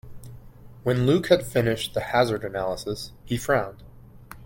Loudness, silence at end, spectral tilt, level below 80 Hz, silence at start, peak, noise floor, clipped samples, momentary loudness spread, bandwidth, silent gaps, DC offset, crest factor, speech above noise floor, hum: -24 LUFS; 0 s; -5.5 dB/octave; -48 dBFS; 0.05 s; -4 dBFS; -45 dBFS; under 0.1%; 13 LU; 17 kHz; none; under 0.1%; 22 dB; 21 dB; none